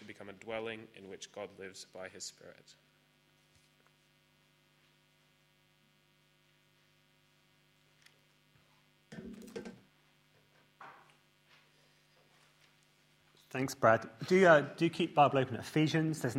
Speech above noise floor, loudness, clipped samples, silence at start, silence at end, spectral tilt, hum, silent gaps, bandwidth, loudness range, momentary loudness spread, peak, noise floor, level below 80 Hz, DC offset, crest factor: 38 dB; -31 LUFS; under 0.1%; 0 s; 0 s; -5.5 dB/octave; 50 Hz at -75 dBFS; none; 16 kHz; 24 LU; 26 LU; -10 dBFS; -70 dBFS; -76 dBFS; under 0.1%; 26 dB